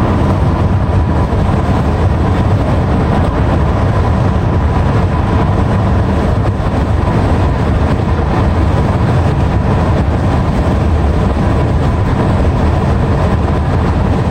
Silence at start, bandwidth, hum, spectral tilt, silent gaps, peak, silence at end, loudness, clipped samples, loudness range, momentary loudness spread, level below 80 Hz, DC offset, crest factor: 0 s; 9.4 kHz; none; -8.5 dB/octave; none; -2 dBFS; 0 s; -13 LUFS; under 0.1%; 0 LU; 1 LU; -16 dBFS; under 0.1%; 10 dB